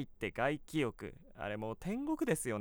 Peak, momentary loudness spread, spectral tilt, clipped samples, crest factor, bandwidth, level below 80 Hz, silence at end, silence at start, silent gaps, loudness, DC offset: -20 dBFS; 10 LU; -5 dB/octave; under 0.1%; 18 dB; over 20 kHz; -58 dBFS; 0 s; 0 s; none; -38 LUFS; under 0.1%